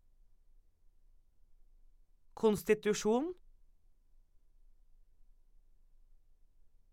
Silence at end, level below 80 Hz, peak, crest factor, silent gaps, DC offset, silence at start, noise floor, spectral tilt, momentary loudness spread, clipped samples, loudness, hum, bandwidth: 3.6 s; -62 dBFS; -16 dBFS; 24 dB; none; under 0.1%; 2.4 s; -64 dBFS; -5 dB/octave; 4 LU; under 0.1%; -33 LUFS; none; 16.5 kHz